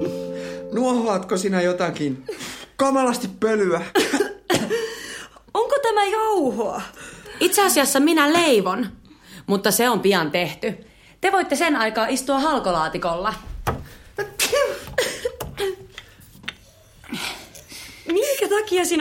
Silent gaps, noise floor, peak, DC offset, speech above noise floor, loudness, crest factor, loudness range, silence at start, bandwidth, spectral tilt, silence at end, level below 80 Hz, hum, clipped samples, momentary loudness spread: none; -50 dBFS; -2 dBFS; under 0.1%; 30 dB; -21 LUFS; 20 dB; 7 LU; 0 s; 16.5 kHz; -3.5 dB/octave; 0 s; -48 dBFS; none; under 0.1%; 18 LU